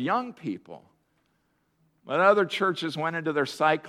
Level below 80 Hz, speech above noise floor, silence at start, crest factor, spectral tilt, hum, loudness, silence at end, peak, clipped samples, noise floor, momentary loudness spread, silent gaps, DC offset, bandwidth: -78 dBFS; 45 dB; 0 s; 20 dB; -5.5 dB/octave; none; -26 LUFS; 0 s; -6 dBFS; under 0.1%; -71 dBFS; 15 LU; none; under 0.1%; 14 kHz